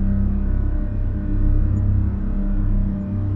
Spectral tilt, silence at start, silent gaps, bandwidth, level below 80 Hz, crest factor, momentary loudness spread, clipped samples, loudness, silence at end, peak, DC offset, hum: -12 dB/octave; 0 s; none; 2.6 kHz; -20 dBFS; 12 dB; 5 LU; under 0.1%; -23 LUFS; 0 s; -8 dBFS; under 0.1%; none